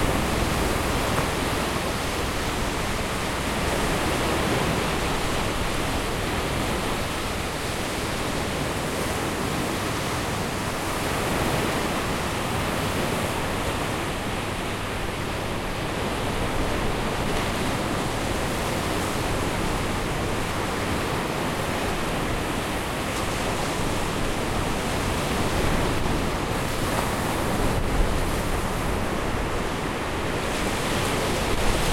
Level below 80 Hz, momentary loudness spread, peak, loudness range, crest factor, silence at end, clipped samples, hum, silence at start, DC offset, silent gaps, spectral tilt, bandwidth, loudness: -34 dBFS; 3 LU; -8 dBFS; 2 LU; 16 dB; 0 s; under 0.1%; none; 0 s; under 0.1%; none; -4.5 dB/octave; 16.5 kHz; -26 LUFS